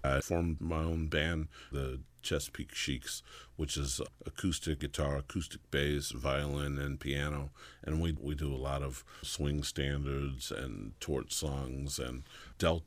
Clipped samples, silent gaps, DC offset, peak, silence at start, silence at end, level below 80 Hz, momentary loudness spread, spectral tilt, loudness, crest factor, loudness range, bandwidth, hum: under 0.1%; none; under 0.1%; -16 dBFS; 0 s; 0.05 s; -44 dBFS; 9 LU; -4.5 dB/octave; -37 LUFS; 20 dB; 2 LU; 15.5 kHz; none